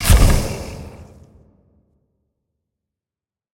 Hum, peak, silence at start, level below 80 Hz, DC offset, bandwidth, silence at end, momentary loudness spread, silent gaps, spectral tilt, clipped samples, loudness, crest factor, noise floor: none; 0 dBFS; 0 s; -22 dBFS; under 0.1%; 16.5 kHz; 2.5 s; 25 LU; none; -4.5 dB/octave; under 0.1%; -18 LUFS; 20 dB; under -90 dBFS